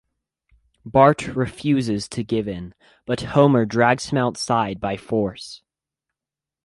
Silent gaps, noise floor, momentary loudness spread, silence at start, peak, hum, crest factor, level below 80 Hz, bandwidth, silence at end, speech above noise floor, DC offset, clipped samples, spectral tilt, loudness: none; -89 dBFS; 15 LU; 0.85 s; -2 dBFS; none; 20 dB; -50 dBFS; 11.5 kHz; 1.1 s; 68 dB; under 0.1%; under 0.1%; -6 dB/octave; -20 LUFS